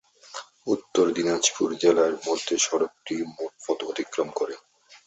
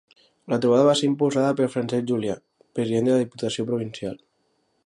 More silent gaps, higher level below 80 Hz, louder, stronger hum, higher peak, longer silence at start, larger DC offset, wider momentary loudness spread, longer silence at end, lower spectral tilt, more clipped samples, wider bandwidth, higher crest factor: neither; second, -70 dBFS vs -64 dBFS; about the same, -25 LUFS vs -23 LUFS; neither; about the same, -6 dBFS vs -6 dBFS; second, 0.3 s vs 0.5 s; neither; about the same, 14 LU vs 16 LU; second, 0.1 s vs 0.7 s; second, -2.5 dB/octave vs -6 dB/octave; neither; second, 8.4 kHz vs 11.5 kHz; about the same, 20 dB vs 18 dB